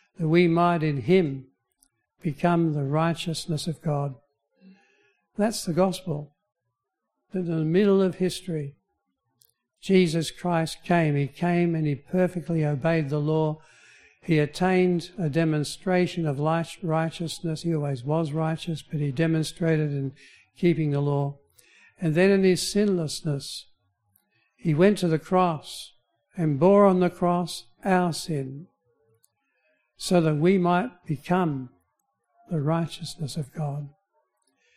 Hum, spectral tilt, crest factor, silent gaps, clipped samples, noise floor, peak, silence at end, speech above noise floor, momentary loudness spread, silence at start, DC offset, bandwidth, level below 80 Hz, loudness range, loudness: none; -6.5 dB/octave; 20 dB; none; under 0.1%; -82 dBFS; -6 dBFS; 0.85 s; 58 dB; 13 LU; 0.2 s; under 0.1%; 14.5 kHz; -58 dBFS; 5 LU; -25 LUFS